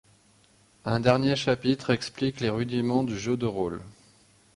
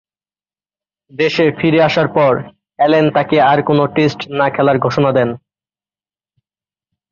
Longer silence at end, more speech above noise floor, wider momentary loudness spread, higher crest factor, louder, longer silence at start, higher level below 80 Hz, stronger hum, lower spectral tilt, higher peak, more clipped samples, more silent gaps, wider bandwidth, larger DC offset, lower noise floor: second, 0.65 s vs 1.75 s; second, 35 dB vs over 77 dB; about the same, 8 LU vs 6 LU; first, 22 dB vs 14 dB; second, -27 LUFS vs -14 LUFS; second, 0.85 s vs 1.15 s; about the same, -56 dBFS vs -54 dBFS; neither; about the same, -6 dB/octave vs -7 dB/octave; second, -6 dBFS vs -2 dBFS; neither; neither; first, 11.5 kHz vs 7.2 kHz; neither; second, -61 dBFS vs under -90 dBFS